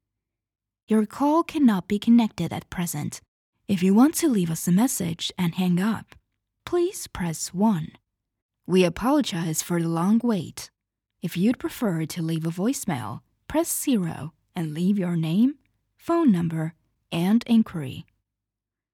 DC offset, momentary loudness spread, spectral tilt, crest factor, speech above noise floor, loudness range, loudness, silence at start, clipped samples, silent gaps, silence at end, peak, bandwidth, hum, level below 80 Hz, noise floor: under 0.1%; 15 LU; -5.5 dB/octave; 16 dB; 65 dB; 4 LU; -24 LUFS; 0.9 s; under 0.1%; 3.28-3.53 s, 8.42-8.49 s; 0.9 s; -8 dBFS; 17.5 kHz; none; -58 dBFS; -88 dBFS